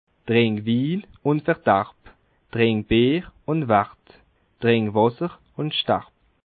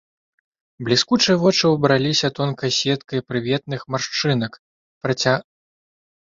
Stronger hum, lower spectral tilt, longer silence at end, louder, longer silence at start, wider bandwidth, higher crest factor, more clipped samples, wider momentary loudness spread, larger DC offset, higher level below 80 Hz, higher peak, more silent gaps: neither; first, -11 dB/octave vs -4.5 dB/octave; second, 0.45 s vs 0.8 s; second, -22 LUFS vs -19 LUFS; second, 0.25 s vs 0.8 s; second, 4.7 kHz vs 7.8 kHz; about the same, 20 dB vs 20 dB; neither; about the same, 11 LU vs 9 LU; neither; first, -48 dBFS vs -58 dBFS; about the same, -4 dBFS vs -2 dBFS; second, none vs 4.59-5.01 s